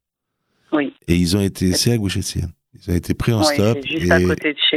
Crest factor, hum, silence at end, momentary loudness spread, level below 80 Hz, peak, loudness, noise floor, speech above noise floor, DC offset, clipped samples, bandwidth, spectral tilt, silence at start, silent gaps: 18 dB; none; 0 s; 8 LU; -42 dBFS; 0 dBFS; -18 LUFS; -76 dBFS; 59 dB; under 0.1%; under 0.1%; 15.5 kHz; -4.5 dB/octave; 0.7 s; none